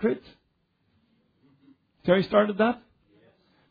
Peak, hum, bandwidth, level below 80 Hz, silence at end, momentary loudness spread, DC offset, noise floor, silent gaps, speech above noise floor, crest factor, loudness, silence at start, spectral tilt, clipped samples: -6 dBFS; none; 5 kHz; -64 dBFS; 0.95 s; 14 LU; under 0.1%; -72 dBFS; none; 48 dB; 22 dB; -25 LUFS; 0 s; -9 dB/octave; under 0.1%